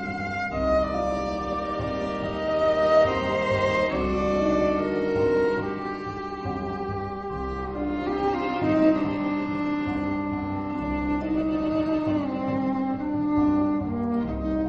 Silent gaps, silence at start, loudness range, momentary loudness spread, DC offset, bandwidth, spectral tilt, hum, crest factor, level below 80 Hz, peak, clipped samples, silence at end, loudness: none; 0 s; 4 LU; 8 LU; under 0.1%; 7.8 kHz; -7.5 dB/octave; none; 16 dB; -42 dBFS; -8 dBFS; under 0.1%; 0 s; -25 LUFS